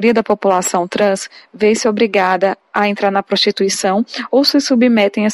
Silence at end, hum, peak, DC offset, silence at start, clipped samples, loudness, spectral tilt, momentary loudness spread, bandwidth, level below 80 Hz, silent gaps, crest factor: 0 s; none; -2 dBFS; under 0.1%; 0 s; under 0.1%; -14 LUFS; -4 dB/octave; 5 LU; 15.5 kHz; -60 dBFS; none; 12 dB